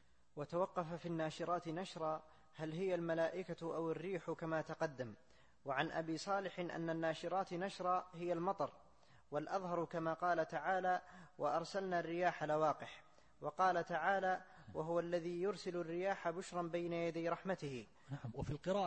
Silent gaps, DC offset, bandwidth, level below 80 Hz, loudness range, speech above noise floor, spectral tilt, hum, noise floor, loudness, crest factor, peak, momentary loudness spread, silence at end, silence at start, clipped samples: none; under 0.1%; 8.4 kHz; -72 dBFS; 3 LU; 28 dB; -6 dB/octave; none; -69 dBFS; -41 LUFS; 20 dB; -22 dBFS; 10 LU; 0 s; 0.35 s; under 0.1%